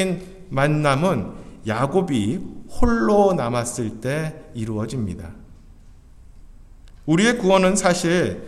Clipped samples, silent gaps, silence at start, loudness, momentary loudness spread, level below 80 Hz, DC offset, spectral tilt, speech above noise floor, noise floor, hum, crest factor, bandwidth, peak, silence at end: under 0.1%; none; 0 s; -21 LUFS; 14 LU; -38 dBFS; under 0.1%; -5.5 dB/octave; 25 dB; -45 dBFS; none; 18 dB; 14 kHz; -2 dBFS; 0 s